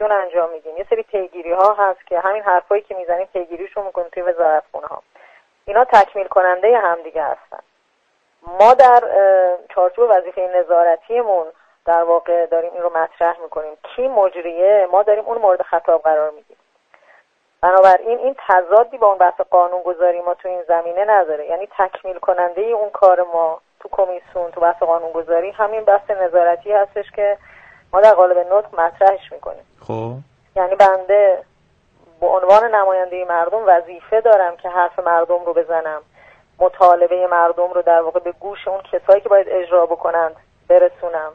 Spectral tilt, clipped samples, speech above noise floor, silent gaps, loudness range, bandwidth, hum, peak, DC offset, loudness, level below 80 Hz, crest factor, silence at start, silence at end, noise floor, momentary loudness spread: -6 dB/octave; under 0.1%; 48 dB; none; 4 LU; 7.2 kHz; none; 0 dBFS; under 0.1%; -16 LUFS; -56 dBFS; 16 dB; 0 s; 0.05 s; -63 dBFS; 13 LU